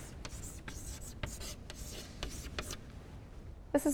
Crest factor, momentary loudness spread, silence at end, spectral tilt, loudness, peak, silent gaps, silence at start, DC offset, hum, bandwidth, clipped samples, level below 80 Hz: 24 dB; 11 LU; 0 s; -4.5 dB/octave; -44 LUFS; -18 dBFS; none; 0 s; under 0.1%; none; over 20 kHz; under 0.1%; -50 dBFS